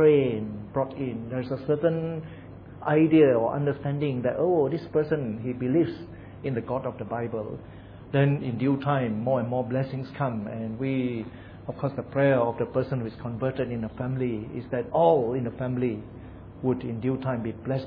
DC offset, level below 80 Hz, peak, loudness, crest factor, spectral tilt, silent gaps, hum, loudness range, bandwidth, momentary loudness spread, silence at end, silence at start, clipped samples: under 0.1%; -54 dBFS; -8 dBFS; -27 LUFS; 18 dB; -11 dB/octave; none; none; 4 LU; 5.2 kHz; 14 LU; 0 s; 0 s; under 0.1%